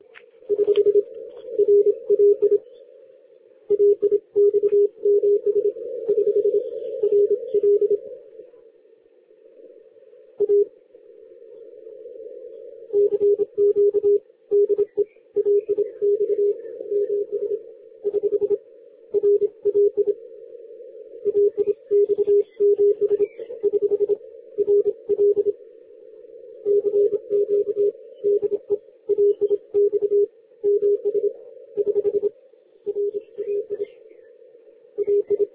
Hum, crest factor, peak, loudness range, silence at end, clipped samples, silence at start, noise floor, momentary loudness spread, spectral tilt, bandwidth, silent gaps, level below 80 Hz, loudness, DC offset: none; 12 dB; -8 dBFS; 7 LU; 0.1 s; under 0.1%; 0.5 s; -55 dBFS; 13 LU; -10 dB/octave; 3.5 kHz; none; -70 dBFS; -21 LUFS; under 0.1%